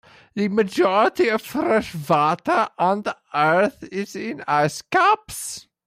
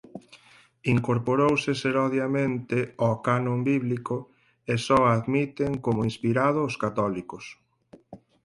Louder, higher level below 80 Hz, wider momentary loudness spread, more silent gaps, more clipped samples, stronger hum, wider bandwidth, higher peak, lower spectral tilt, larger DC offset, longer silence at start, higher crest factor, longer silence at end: first, -21 LUFS vs -25 LUFS; about the same, -60 dBFS vs -58 dBFS; about the same, 12 LU vs 12 LU; neither; neither; neither; first, 16 kHz vs 11.5 kHz; about the same, -6 dBFS vs -8 dBFS; second, -5 dB/octave vs -7 dB/octave; neither; first, 0.35 s vs 0.15 s; about the same, 14 dB vs 18 dB; about the same, 0.25 s vs 0.3 s